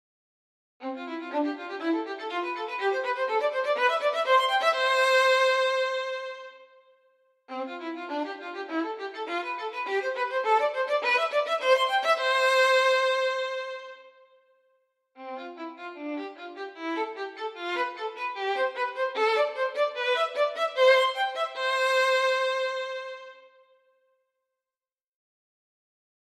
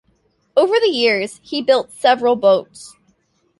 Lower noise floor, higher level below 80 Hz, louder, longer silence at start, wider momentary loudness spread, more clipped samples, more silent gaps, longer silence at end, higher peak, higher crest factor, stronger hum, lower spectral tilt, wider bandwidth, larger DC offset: first, under -90 dBFS vs -62 dBFS; second, under -90 dBFS vs -64 dBFS; second, -26 LUFS vs -16 LUFS; first, 0.8 s vs 0.55 s; first, 17 LU vs 7 LU; neither; neither; first, 2.75 s vs 0.7 s; second, -8 dBFS vs -2 dBFS; about the same, 20 dB vs 16 dB; neither; second, 0 dB/octave vs -3.5 dB/octave; first, 14.5 kHz vs 11.5 kHz; neither